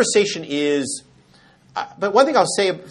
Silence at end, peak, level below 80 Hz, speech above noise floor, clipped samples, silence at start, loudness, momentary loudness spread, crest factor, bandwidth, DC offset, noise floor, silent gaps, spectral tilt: 0 s; 0 dBFS; -66 dBFS; 33 dB; under 0.1%; 0 s; -19 LUFS; 14 LU; 18 dB; 11.5 kHz; under 0.1%; -52 dBFS; none; -3 dB/octave